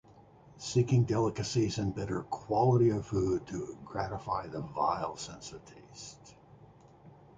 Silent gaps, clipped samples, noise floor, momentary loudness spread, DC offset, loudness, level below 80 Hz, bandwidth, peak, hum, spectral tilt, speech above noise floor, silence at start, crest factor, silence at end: none; under 0.1%; -57 dBFS; 19 LU; under 0.1%; -32 LUFS; -56 dBFS; 9 kHz; -14 dBFS; none; -6.5 dB/octave; 26 dB; 0.2 s; 18 dB; 0.25 s